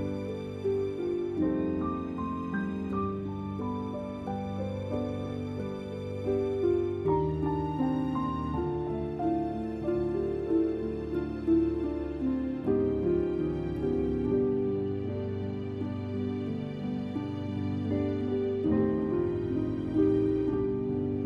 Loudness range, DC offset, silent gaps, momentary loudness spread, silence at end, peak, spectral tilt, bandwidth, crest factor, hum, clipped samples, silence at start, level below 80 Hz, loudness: 5 LU; under 0.1%; none; 7 LU; 0 s; -14 dBFS; -9.5 dB/octave; 7.4 kHz; 16 dB; none; under 0.1%; 0 s; -48 dBFS; -31 LUFS